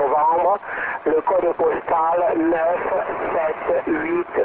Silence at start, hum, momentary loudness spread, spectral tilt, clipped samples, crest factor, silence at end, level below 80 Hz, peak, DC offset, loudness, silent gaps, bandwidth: 0 s; none; 5 LU; -9.5 dB/octave; under 0.1%; 12 dB; 0 s; -54 dBFS; -8 dBFS; 0.1%; -20 LUFS; none; 4 kHz